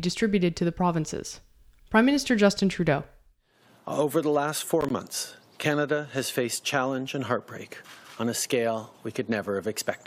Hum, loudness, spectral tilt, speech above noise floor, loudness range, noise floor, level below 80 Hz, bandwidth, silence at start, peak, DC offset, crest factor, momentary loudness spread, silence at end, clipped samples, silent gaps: none; -27 LUFS; -4.5 dB/octave; 35 dB; 4 LU; -61 dBFS; -56 dBFS; 16.5 kHz; 0 s; -6 dBFS; under 0.1%; 20 dB; 15 LU; 0.1 s; under 0.1%; none